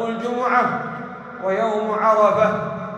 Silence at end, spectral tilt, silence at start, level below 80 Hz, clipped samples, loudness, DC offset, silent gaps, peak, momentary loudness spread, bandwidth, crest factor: 0 s; -6.5 dB/octave; 0 s; -62 dBFS; under 0.1%; -19 LUFS; under 0.1%; none; -4 dBFS; 13 LU; 9.4 kHz; 16 dB